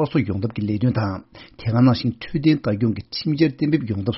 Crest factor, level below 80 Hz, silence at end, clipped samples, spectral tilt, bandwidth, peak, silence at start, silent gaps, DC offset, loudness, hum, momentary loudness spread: 16 dB; -50 dBFS; 0 s; under 0.1%; -7 dB/octave; 6 kHz; -6 dBFS; 0 s; none; under 0.1%; -21 LUFS; none; 8 LU